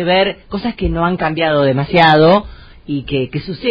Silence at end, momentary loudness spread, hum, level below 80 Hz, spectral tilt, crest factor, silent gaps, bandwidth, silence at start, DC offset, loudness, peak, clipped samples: 0 s; 13 LU; none; -32 dBFS; -8 dB/octave; 14 dB; none; 6.6 kHz; 0 s; under 0.1%; -14 LUFS; 0 dBFS; under 0.1%